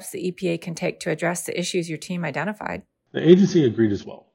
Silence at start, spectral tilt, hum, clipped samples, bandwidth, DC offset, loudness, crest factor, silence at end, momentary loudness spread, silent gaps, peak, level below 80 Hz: 0 s; -6 dB/octave; none; under 0.1%; 16.5 kHz; under 0.1%; -22 LUFS; 22 dB; 0.15 s; 15 LU; none; 0 dBFS; -64 dBFS